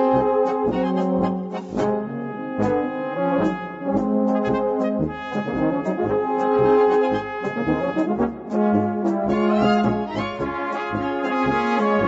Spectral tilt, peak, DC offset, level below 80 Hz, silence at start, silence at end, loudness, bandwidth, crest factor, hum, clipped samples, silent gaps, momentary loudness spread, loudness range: -8 dB/octave; -6 dBFS; under 0.1%; -48 dBFS; 0 s; 0 s; -22 LUFS; 7.8 kHz; 14 dB; none; under 0.1%; none; 8 LU; 3 LU